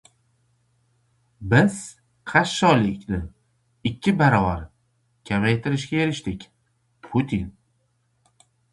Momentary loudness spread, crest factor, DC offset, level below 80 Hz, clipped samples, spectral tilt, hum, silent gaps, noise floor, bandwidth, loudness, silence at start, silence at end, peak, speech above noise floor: 19 LU; 22 dB; under 0.1%; -46 dBFS; under 0.1%; -6 dB/octave; none; none; -68 dBFS; 11.5 kHz; -22 LUFS; 1.4 s; 1.25 s; -2 dBFS; 47 dB